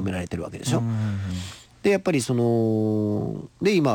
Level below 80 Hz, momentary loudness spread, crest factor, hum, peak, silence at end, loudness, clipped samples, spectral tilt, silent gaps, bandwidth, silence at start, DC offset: -52 dBFS; 10 LU; 14 dB; none; -10 dBFS; 0 s; -24 LUFS; under 0.1%; -6.5 dB/octave; none; 18 kHz; 0 s; under 0.1%